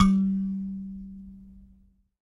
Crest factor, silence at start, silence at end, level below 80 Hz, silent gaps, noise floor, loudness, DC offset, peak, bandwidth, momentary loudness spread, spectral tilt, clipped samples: 22 dB; 0 s; 0.6 s; -46 dBFS; none; -60 dBFS; -28 LUFS; under 0.1%; -6 dBFS; 10.5 kHz; 23 LU; -7.5 dB/octave; under 0.1%